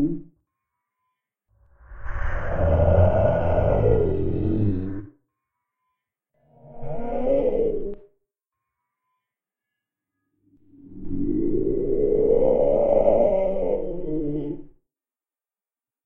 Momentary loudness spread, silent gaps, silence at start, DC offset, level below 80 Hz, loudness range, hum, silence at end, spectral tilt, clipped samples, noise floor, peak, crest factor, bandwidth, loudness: 17 LU; none; 0 s; under 0.1%; -34 dBFS; 9 LU; none; 1.35 s; -11 dB/octave; under 0.1%; under -90 dBFS; -4 dBFS; 18 dB; 3.3 kHz; -23 LUFS